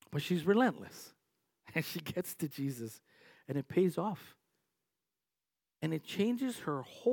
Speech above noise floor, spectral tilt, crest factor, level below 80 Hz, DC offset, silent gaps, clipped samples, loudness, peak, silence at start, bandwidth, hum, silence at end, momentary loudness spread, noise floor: over 55 dB; -6 dB/octave; 20 dB; -80 dBFS; under 0.1%; none; under 0.1%; -35 LUFS; -16 dBFS; 0.1 s; 18 kHz; none; 0 s; 17 LU; under -90 dBFS